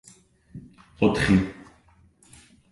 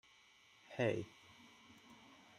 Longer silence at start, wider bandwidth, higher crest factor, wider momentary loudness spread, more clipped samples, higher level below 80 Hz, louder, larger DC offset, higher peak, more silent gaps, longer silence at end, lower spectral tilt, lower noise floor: second, 0.55 s vs 0.7 s; second, 11.5 kHz vs 13.5 kHz; about the same, 20 dB vs 22 dB; about the same, 26 LU vs 26 LU; neither; first, -44 dBFS vs -80 dBFS; first, -23 LUFS vs -42 LUFS; neither; first, -6 dBFS vs -24 dBFS; neither; first, 1.2 s vs 0.45 s; about the same, -6.5 dB/octave vs -6 dB/octave; second, -58 dBFS vs -68 dBFS